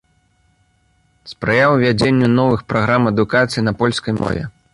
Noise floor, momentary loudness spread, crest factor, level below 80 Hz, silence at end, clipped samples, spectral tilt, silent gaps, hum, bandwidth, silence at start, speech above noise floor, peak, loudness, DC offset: -59 dBFS; 8 LU; 14 dB; -44 dBFS; 0.25 s; under 0.1%; -6.5 dB/octave; none; none; 11.5 kHz; 1.25 s; 44 dB; -2 dBFS; -16 LUFS; under 0.1%